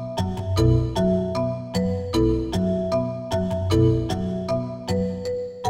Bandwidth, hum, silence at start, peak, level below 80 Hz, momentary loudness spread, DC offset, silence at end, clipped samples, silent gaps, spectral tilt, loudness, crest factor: 15.5 kHz; none; 0 s; -6 dBFS; -36 dBFS; 7 LU; under 0.1%; 0 s; under 0.1%; none; -7.5 dB/octave; -23 LUFS; 16 dB